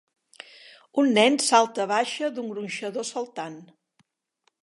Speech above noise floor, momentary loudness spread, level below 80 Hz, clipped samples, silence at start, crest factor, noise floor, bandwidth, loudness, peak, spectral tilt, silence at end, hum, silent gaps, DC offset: 48 dB; 19 LU; -82 dBFS; under 0.1%; 0.95 s; 20 dB; -72 dBFS; 11.5 kHz; -24 LUFS; -6 dBFS; -3 dB/octave; 1 s; none; none; under 0.1%